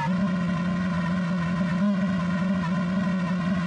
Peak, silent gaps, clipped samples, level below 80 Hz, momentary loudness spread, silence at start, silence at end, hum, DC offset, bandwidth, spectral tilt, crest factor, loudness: -14 dBFS; none; under 0.1%; -52 dBFS; 2 LU; 0 s; 0 s; none; under 0.1%; 8.4 kHz; -7.5 dB/octave; 10 dB; -25 LUFS